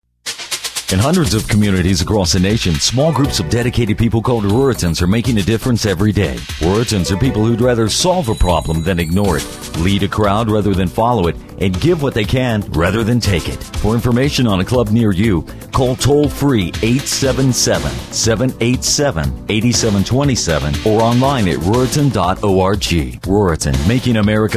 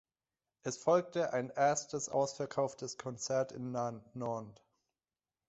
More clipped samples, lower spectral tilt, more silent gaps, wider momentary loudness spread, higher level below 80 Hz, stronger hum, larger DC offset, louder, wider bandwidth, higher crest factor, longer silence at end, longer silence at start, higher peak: neither; about the same, -5 dB/octave vs -4.5 dB/octave; neither; second, 4 LU vs 11 LU; first, -26 dBFS vs -76 dBFS; neither; neither; first, -15 LUFS vs -36 LUFS; first, 15.5 kHz vs 8.2 kHz; second, 12 dB vs 20 dB; second, 0 s vs 1 s; second, 0.25 s vs 0.65 s; first, -2 dBFS vs -16 dBFS